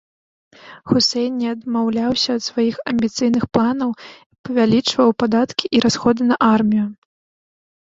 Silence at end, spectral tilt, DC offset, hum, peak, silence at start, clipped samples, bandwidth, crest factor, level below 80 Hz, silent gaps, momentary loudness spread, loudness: 1 s; -5 dB/octave; under 0.1%; none; 0 dBFS; 0.65 s; under 0.1%; 7.8 kHz; 18 dB; -54 dBFS; 4.26-4.30 s, 4.38-4.44 s; 8 LU; -18 LUFS